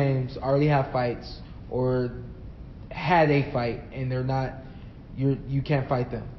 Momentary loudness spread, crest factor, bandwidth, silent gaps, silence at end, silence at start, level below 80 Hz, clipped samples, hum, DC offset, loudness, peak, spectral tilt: 20 LU; 18 dB; 6 kHz; none; 0 s; 0 s; -44 dBFS; under 0.1%; none; under 0.1%; -26 LUFS; -8 dBFS; -6.5 dB/octave